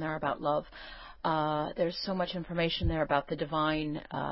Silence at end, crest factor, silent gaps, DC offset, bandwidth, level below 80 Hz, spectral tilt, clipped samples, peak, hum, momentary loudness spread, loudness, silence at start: 0 s; 18 dB; none; under 0.1%; 5.8 kHz; -46 dBFS; -9.5 dB/octave; under 0.1%; -14 dBFS; none; 6 LU; -32 LUFS; 0 s